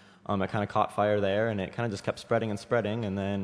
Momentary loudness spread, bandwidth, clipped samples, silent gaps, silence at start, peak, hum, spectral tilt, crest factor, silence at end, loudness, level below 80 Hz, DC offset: 6 LU; 11 kHz; under 0.1%; none; 0.3 s; -10 dBFS; none; -6.5 dB/octave; 18 dB; 0 s; -29 LUFS; -64 dBFS; under 0.1%